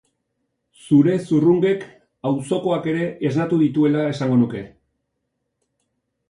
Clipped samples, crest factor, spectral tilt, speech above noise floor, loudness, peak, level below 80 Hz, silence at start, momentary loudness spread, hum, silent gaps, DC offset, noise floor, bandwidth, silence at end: under 0.1%; 16 dB; -8 dB/octave; 57 dB; -19 LUFS; -4 dBFS; -60 dBFS; 0.85 s; 8 LU; none; none; under 0.1%; -76 dBFS; 11 kHz; 1.6 s